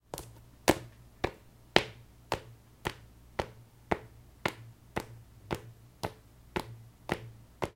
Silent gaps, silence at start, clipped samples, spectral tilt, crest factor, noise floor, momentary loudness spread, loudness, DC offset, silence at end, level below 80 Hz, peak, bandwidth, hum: none; 0.15 s; under 0.1%; -4 dB/octave; 38 dB; -51 dBFS; 24 LU; -36 LUFS; under 0.1%; 0.05 s; -54 dBFS; 0 dBFS; 17 kHz; none